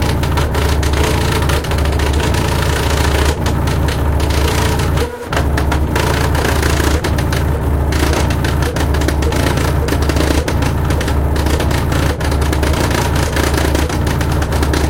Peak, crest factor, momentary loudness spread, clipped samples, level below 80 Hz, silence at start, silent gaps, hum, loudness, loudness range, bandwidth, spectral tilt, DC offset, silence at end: 0 dBFS; 14 dB; 2 LU; under 0.1%; -18 dBFS; 0 s; none; none; -15 LUFS; 0 LU; 17 kHz; -5.5 dB/octave; under 0.1%; 0 s